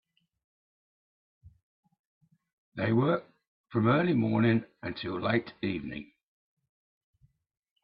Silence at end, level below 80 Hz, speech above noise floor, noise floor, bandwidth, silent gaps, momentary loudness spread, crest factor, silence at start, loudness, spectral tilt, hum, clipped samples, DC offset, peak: 1.8 s; -66 dBFS; over 62 dB; under -90 dBFS; 5.4 kHz; 1.63-1.83 s, 1.99-2.21 s, 2.53-2.72 s, 3.48-3.64 s; 13 LU; 20 dB; 1.45 s; -29 LUFS; -11 dB/octave; none; under 0.1%; under 0.1%; -12 dBFS